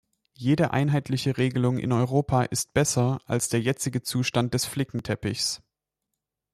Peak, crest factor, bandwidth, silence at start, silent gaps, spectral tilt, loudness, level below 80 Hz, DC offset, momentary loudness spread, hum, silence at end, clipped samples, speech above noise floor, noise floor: -8 dBFS; 18 dB; 14 kHz; 0.4 s; none; -5 dB/octave; -25 LUFS; -54 dBFS; under 0.1%; 6 LU; none; 0.95 s; under 0.1%; 59 dB; -84 dBFS